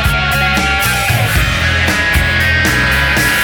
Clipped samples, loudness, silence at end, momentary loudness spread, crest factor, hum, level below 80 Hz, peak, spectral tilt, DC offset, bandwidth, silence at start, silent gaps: under 0.1%; -11 LUFS; 0 s; 2 LU; 12 dB; none; -22 dBFS; 0 dBFS; -3.5 dB/octave; under 0.1%; over 20 kHz; 0 s; none